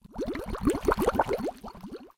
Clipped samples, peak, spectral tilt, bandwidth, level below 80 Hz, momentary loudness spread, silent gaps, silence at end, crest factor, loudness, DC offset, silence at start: under 0.1%; -8 dBFS; -6 dB/octave; 17 kHz; -42 dBFS; 17 LU; none; 0.1 s; 22 dB; -29 LUFS; under 0.1%; 0.05 s